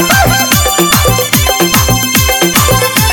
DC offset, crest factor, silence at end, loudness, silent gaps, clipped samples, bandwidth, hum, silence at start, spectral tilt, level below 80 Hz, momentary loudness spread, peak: 0.2%; 8 dB; 0 s; -8 LUFS; none; 0.4%; over 20 kHz; none; 0 s; -3 dB/octave; -20 dBFS; 1 LU; 0 dBFS